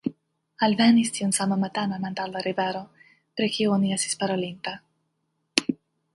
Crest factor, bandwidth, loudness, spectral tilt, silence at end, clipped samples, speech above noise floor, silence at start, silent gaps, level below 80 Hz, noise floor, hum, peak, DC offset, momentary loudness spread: 26 dB; 11.5 kHz; -25 LUFS; -4 dB/octave; 0.4 s; under 0.1%; 51 dB; 0.05 s; none; -68 dBFS; -75 dBFS; none; 0 dBFS; under 0.1%; 15 LU